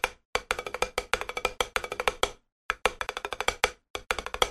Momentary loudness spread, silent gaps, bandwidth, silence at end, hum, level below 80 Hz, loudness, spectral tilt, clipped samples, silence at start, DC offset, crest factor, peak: 6 LU; 0.25-0.33 s, 2.52-2.69 s, 3.90-3.94 s; 13.5 kHz; 0 s; none; -48 dBFS; -30 LUFS; -1 dB/octave; under 0.1%; 0.05 s; under 0.1%; 28 dB; -4 dBFS